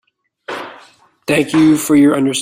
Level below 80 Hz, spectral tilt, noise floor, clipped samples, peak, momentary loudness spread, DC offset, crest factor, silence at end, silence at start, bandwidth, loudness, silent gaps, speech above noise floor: -54 dBFS; -4.5 dB/octave; -46 dBFS; under 0.1%; -2 dBFS; 17 LU; under 0.1%; 14 dB; 0 s; 0.5 s; 16 kHz; -12 LUFS; none; 35 dB